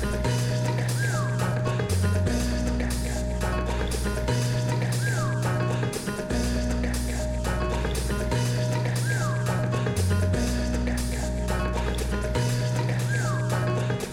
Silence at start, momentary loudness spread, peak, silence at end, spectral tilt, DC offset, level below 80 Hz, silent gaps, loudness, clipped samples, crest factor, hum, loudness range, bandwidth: 0 s; 3 LU; -12 dBFS; 0 s; -5.5 dB/octave; under 0.1%; -32 dBFS; none; -26 LUFS; under 0.1%; 14 dB; none; 1 LU; 16.5 kHz